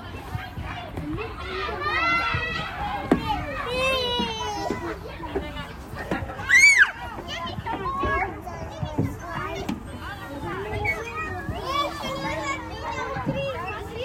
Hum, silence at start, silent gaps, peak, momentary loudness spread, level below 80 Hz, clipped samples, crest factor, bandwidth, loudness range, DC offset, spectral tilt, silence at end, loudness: none; 0 s; none; -6 dBFS; 13 LU; -42 dBFS; under 0.1%; 22 dB; 16 kHz; 9 LU; under 0.1%; -3.5 dB/octave; 0 s; -25 LUFS